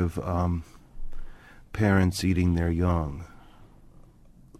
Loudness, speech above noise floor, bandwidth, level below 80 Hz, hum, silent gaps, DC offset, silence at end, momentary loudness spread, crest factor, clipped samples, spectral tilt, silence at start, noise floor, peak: -26 LUFS; 28 dB; 13.5 kHz; -40 dBFS; none; none; under 0.1%; 0.95 s; 24 LU; 18 dB; under 0.1%; -7 dB/octave; 0 s; -53 dBFS; -10 dBFS